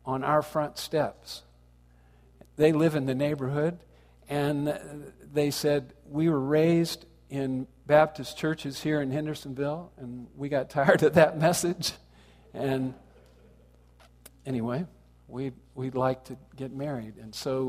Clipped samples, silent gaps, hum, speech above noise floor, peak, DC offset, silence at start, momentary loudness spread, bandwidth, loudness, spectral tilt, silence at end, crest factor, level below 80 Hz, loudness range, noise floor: under 0.1%; none; 60 Hz at -60 dBFS; 30 dB; -4 dBFS; under 0.1%; 0.05 s; 18 LU; 15.5 kHz; -28 LUFS; -5.5 dB/octave; 0 s; 24 dB; -58 dBFS; 9 LU; -58 dBFS